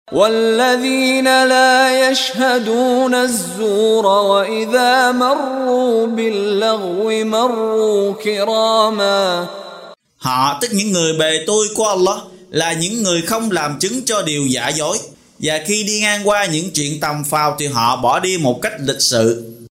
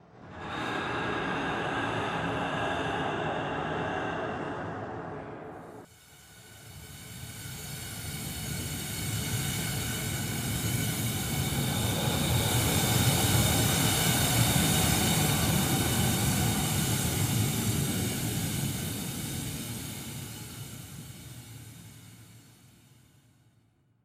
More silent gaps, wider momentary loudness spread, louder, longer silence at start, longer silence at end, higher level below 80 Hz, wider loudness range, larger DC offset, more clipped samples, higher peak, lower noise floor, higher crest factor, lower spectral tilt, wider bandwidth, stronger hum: neither; second, 7 LU vs 19 LU; first, -15 LUFS vs -29 LUFS; about the same, 0.1 s vs 0.15 s; second, 0.05 s vs 1.55 s; second, -56 dBFS vs -46 dBFS; second, 4 LU vs 17 LU; neither; neither; first, 0 dBFS vs -12 dBFS; second, -38 dBFS vs -66 dBFS; about the same, 16 dB vs 18 dB; about the same, -3 dB/octave vs -3.5 dB/octave; about the same, 16 kHz vs 16 kHz; neither